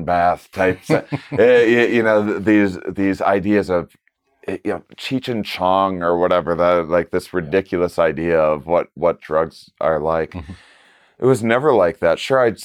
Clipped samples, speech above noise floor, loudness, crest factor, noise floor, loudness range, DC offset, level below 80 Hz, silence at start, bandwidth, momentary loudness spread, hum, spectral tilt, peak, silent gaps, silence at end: under 0.1%; 35 dB; -18 LUFS; 14 dB; -52 dBFS; 4 LU; under 0.1%; -48 dBFS; 0 s; 14.5 kHz; 10 LU; none; -6.5 dB/octave; -4 dBFS; none; 0 s